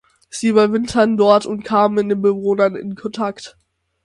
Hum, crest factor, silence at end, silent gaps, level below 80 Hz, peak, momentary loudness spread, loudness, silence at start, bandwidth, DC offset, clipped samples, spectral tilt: none; 16 dB; 0.55 s; none; -54 dBFS; 0 dBFS; 12 LU; -17 LUFS; 0.35 s; 11.5 kHz; under 0.1%; under 0.1%; -5.5 dB/octave